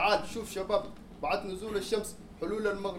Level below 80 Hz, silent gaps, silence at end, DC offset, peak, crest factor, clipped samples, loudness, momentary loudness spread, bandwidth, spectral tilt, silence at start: -54 dBFS; none; 0 s; under 0.1%; -14 dBFS; 18 dB; under 0.1%; -33 LUFS; 8 LU; 16.5 kHz; -4 dB/octave; 0 s